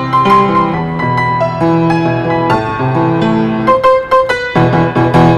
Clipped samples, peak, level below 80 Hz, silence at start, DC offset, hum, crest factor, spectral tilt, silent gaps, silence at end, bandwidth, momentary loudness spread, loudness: under 0.1%; 0 dBFS; -36 dBFS; 0 s; under 0.1%; none; 10 dB; -7.5 dB/octave; none; 0 s; 11 kHz; 4 LU; -11 LUFS